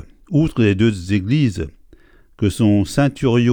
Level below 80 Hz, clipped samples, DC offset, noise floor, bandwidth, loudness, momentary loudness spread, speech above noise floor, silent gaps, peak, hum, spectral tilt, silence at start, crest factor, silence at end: -40 dBFS; under 0.1%; under 0.1%; -48 dBFS; 17.5 kHz; -17 LUFS; 6 LU; 32 dB; none; -2 dBFS; none; -7 dB/octave; 0.3 s; 16 dB; 0 s